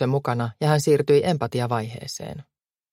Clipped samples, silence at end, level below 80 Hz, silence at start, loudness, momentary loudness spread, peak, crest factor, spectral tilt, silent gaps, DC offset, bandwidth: under 0.1%; 0.5 s; -60 dBFS; 0 s; -23 LUFS; 15 LU; -6 dBFS; 18 dB; -6 dB/octave; none; under 0.1%; 16 kHz